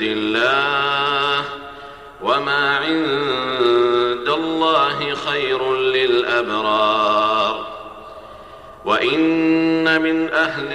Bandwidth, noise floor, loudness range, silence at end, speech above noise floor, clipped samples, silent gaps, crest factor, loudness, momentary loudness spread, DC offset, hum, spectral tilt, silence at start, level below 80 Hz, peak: 11 kHz; -39 dBFS; 2 LU; 0 s; 21 dB; under 0.1%; none; 14 dB; -18 LUFS; 15 LU; under 0.1%; none; -5 dB/octave; 0 s; -52 dBFS; -4 dBFS